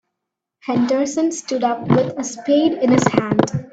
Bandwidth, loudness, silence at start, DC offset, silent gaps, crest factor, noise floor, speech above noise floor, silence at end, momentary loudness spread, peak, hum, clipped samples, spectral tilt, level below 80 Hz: 9 kHz; -18 LUFS; 0.65 s; under 0.1%; none; 18 dB; -81 dBFS; 64 dB; 0.05 s; 7 LU; 0 dBFS; none; under 0.1%; -5.5 dB/octave; -56 dBFS